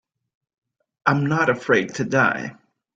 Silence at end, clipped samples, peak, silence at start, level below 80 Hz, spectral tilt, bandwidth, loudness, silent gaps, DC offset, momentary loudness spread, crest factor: 0.45 s; under 0.1%; -4 dBFS; 1.05 s; -60 dBFS; -6 dB/octave; 7.8 kHz; -20 LUFS; none; under 0.1%; 7 LU; 20 dB